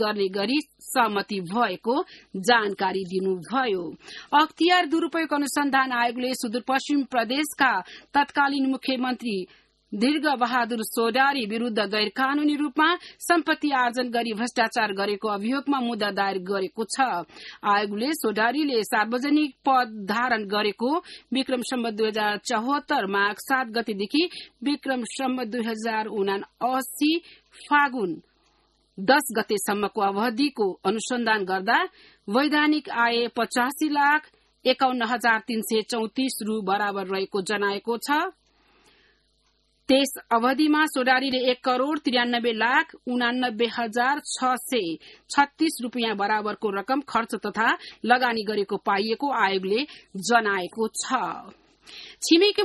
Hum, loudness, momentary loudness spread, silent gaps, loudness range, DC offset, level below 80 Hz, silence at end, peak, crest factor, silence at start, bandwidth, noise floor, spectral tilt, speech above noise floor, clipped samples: none; -24 LUFS; 7 LU; none; 3 LU; under 0.1%; -70 dBFS; 0 s; -6 dBFS; 20 dB; 0 s; 12.5 kHz; -67 dBFS; -3.5 dB/octave; 43 dB; under 0.1%